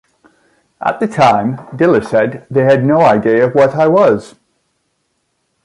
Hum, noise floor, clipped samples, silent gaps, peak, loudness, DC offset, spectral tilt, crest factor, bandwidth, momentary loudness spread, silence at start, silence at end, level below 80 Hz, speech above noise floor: none; -66 dBFS; under 0.1%; none; 0 dBFS; -12 LUFS; under 0.1%; -7.5 dB/octave; 14 dB; 11.5 kHz; 8 LU; 0.8 s; 1.35 s; -52 dBFS; 54 dB